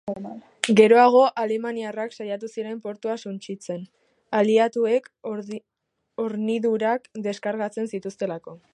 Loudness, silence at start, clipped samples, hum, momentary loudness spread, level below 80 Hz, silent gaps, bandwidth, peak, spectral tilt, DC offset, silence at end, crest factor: -23 LUFS; 0.05 s; under 0.1%; none; 18 LU; -74 dBFS; none; 11.5 kHz; -2 dBFS; -5 dB/octave; under 0.1%; 0.15 s; 22 dB